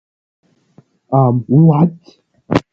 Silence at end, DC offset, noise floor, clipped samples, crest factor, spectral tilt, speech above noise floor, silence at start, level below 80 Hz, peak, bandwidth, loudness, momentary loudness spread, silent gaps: 0.1 s; under 0.1%; -51 dBFS; under 0.1%; 16 dB; -10 dB/octave; 39 dB; 1.1 s; -48 dBFS; 0 dBFS; 6.8 kHz; -13 LUFS; 8 LU; none